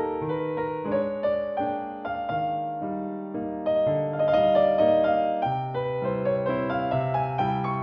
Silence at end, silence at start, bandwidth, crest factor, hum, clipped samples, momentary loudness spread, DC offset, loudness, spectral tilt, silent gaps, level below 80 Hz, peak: 0 s; 0 s; 5.4 kHz; 16 dB; none; under 0.1%; 11 LU; under 0.1%; -26 LUFS; -9.5 dB/octave; none; -56 dBFS; -10 dBFS